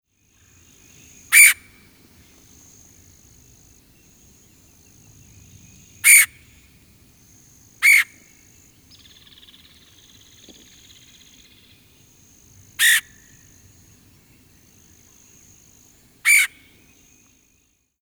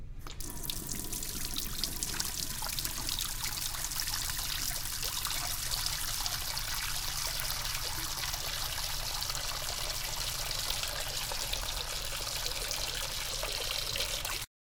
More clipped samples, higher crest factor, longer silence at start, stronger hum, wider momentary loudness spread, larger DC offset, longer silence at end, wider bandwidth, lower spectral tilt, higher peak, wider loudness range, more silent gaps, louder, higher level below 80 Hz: neither; about the same, 24 dB vs 24 dB; first, 1.3 s vs 0 s; neither; first, 14 LU vs 3 LU; neither; first, 1.55 s vs 0.2 s; about the same, over 20 kHz vs 19 kHz; second, 3 dB/octave vs -1 dB/octave; first, 0 dBFS vs -12 dBFS; first, 7 LU vs 1 LU; neither; first, -14 LUFS vs -34 LUFS; second, -62 dBFS vs -44 dBFS